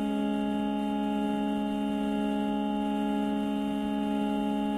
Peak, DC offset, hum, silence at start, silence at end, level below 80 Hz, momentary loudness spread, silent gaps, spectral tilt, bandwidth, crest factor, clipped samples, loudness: -20 dBFS; under 0.1%; none; 0 s; 0 s; -54 dBFS; 1 LU; none; -7 dB/octave; 13 kHz; 10 dB; under 0.1%; -30 LUFS